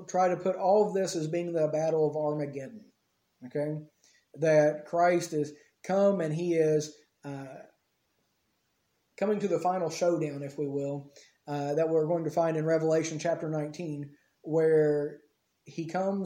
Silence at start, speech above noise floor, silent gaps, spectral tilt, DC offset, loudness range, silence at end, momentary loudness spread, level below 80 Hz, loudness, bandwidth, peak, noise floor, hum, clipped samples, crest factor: 0 s; 47 dB; none; -6.5 dB/octave; under 0.1%; 5 LU; 0 s; 16 LU; -78 dBFS; -29 LUFS; 16 kHz; -12 dBFS; -76 dBFS; none; under 0.1%; 18 dB